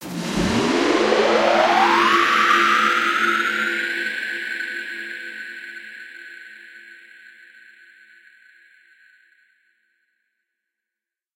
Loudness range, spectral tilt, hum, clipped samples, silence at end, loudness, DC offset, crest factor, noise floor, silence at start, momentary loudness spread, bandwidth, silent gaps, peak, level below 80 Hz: 21 LU; -3.5 dB/octave; none; under 0.1%; 4.4 s; -18 LUFS; under 0.1%; 20 dB; -87 dBFS; 0 s; 22 LU; 16 kHz; none; -4 dBFS; -52 dBFS